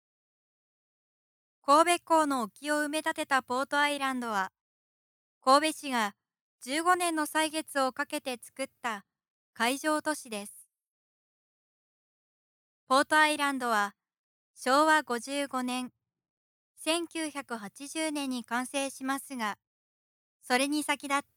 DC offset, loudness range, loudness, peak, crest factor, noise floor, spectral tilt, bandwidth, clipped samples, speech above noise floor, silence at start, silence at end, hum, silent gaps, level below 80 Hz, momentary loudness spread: under 0.1%; 7 LU; -29 LUFS; -8 dBFS; 22 dB; under -90 dBFS; -1.5 dB/octave; 19 kHz; under 0.1%; over 61 dB; 1.65 s; 0.15 s; none; 4.61-5.41 s, 6.41-6.59 s, 9.30-9.53 s, 10.90-12.87 s, 14.19-14.54 s, 16.30-16.75 s, 19.67-20.40 s; -84 dBFS; 14 LU